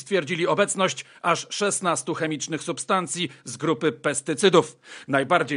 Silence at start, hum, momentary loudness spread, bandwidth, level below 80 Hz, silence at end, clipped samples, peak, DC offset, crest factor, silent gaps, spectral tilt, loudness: 0 s; none; 8 LU; 11 kHz; -76 dBFS; 0 s; under 0.1%; -4 dBFS; under 0.1%; 20 dB; none; -3.5 dB/octave; -24 LUFS